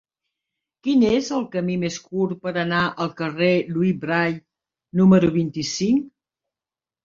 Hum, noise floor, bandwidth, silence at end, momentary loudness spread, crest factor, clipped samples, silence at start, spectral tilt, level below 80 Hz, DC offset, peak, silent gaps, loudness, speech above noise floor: none; under -90 dBFS; 7.6 kHz; 0.95 s; 10 LU; 18 dB; under 0.1%; 0.85 s; -6 dB/octave; -56 dBFS; under 0.1%; -4 dBFS; none; -21 LUFS; over 70 dB